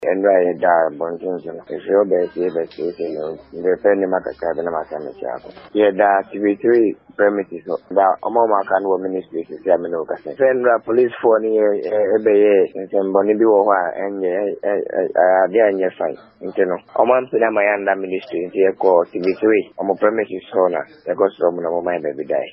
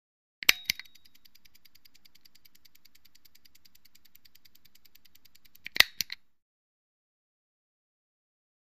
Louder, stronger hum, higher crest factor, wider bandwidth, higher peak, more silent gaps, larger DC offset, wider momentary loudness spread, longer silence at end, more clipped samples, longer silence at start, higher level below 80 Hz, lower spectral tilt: first, -18 LUFS vs -27 LUFS; neither; second, 18 dB vs 38 dB; second, 5.6 kHz vs 15.5 kHz; about the same, 0 dBFS vs 0 dBFS; neither; second, under 0.1% vs 0.2%; second, 11 LU vs 19 LU; second, 0 s vs 2.9 s; neither; second, 0 s vs 0.5 s; about the same, -62 dBFS vs -66 dBFS; first, -5 dB/octave vs 1.5 dB/octave